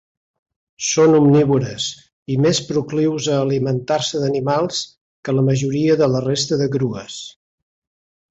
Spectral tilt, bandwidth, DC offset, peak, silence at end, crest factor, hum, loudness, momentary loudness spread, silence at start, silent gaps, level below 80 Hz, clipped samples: -5.5 dB/octave; 8.2 kHz; under 0.1%; -4 dBFS; 1 s; 16 dB; none; -18 LUFS; 13 LU; 0.8 s; 2.13-2.26 s, 5.01-5.23 s; -54 dBFS; under 0.1%